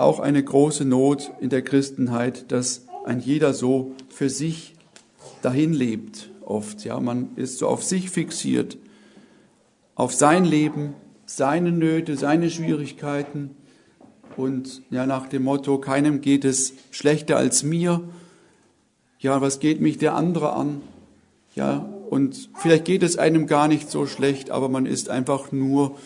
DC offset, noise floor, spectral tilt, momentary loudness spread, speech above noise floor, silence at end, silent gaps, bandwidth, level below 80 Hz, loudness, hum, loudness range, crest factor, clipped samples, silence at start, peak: under 0.1%; -64 dBFS; -5.5 dB/octave; 11 LU; 42 dB; 0 s; none; 11 kHz; -66 dBFS; -22 LUFS; none; 5 LU; 20 dB; under 0.1%; 0 s; -2 dBFS